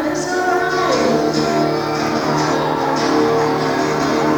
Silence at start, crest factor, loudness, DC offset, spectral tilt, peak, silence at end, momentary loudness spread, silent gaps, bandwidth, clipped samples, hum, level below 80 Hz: 0 s; 14 dB; -17 LUFS; under 0.1%; -5 dB/octave; -4 dBFS; 0 s; 3 LU; none; over 20 kHz; under 0.1%; none; -48 dBFS